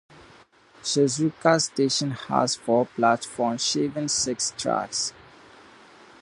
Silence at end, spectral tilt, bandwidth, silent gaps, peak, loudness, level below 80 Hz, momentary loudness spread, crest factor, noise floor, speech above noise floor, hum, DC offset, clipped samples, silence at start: 1.1 s; -3.5 dB/octave; 11.5 kHz; none; -4 dBFS; -24 LUFS; -64 dBFS; 6 LU; 22 dB; -54 dBFS; 30 dB; none; under 0.1%; under 0.1%; 0.2 s